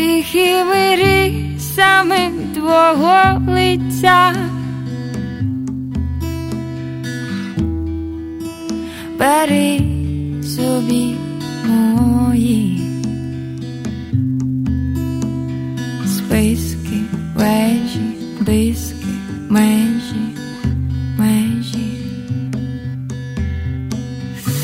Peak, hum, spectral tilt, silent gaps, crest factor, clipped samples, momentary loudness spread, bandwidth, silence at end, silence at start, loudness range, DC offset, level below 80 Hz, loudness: 0 dBFS; none; -5.5 dB/octave; none; 16 dB; under 0.1%; 13 LU; 16.5 kHz; 0 s; 0 s; 10 LU; under 0.1%; -32 dBFS; -17 LUFS